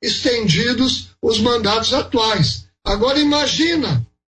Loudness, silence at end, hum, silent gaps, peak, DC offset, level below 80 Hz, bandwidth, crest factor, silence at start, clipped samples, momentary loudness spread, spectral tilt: -17 LUFS; 0.3 s; none; none; -2 dBFS; under 0.1%; -38 dBFS; 9.6 kHz; 16 dB; 0 s; under 0.1%; 6 LU; -4.5 dB/octave